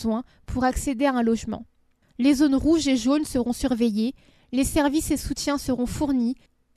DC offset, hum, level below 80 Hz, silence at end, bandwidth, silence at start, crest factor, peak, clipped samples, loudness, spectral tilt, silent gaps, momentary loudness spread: under 0.1%; none; -40 dBFS; 0.4 s; 13.5 kHz; 0 s; 16 dB; -8 dBFS; under 0.1%; -24 LUFS; -4.5 dB/octave; none; 10 LU